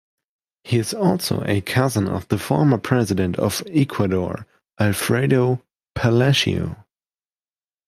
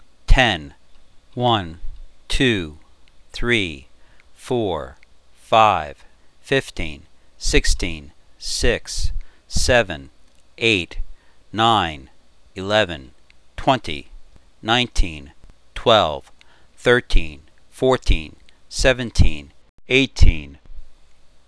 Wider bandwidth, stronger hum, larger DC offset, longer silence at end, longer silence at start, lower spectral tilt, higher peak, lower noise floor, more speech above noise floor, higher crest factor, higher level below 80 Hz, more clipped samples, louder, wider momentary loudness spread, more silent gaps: first, 15.5 kHz vs 11 kHz; neither; second, under 0.1% vs 0.4%; first, 1.05 s vs 0.55 s; first, 0.65 s vs 0.3 s; first, -5.5 dB/octave vs -4 dB/octave; about the same, -2 dBFS vs 0 dBFS; first, under -90 dBFS vs -50 dBFS; first, over 71 dB vs 32 dB; about the same, 18 dB vs 20 dB; second, -52 dBFS vs -26 dBFS; neither; about the same, -20 LUFS vs -20 LUFS; second, 8 LU vs 20 LU; second, none vs 19.69-19.78 s